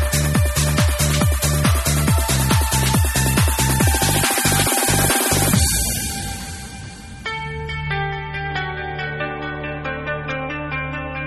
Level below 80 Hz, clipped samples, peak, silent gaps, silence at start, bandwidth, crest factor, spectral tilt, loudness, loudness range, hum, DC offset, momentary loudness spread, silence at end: -26 dBFS; under 0.1%; -4 dBFS; none; 0 s; 14 kHz; 16 dB; -3.5 dB/octave; -19 LUFS; 9 LU; none; under 0.1%; 11 LU; 0 s